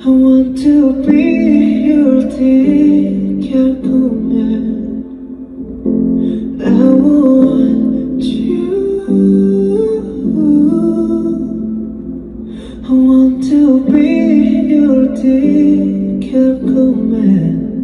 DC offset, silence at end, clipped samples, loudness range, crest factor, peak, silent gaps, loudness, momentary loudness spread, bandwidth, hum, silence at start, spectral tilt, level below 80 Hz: under 0.1%; 0 s; under 0.1%; 5 LU; 10 dB; 0 dBFS; none; -11 LUFS; 12 LU; 9.8 kHz; none; 0 s; -9 dB/octave; -38 dBFS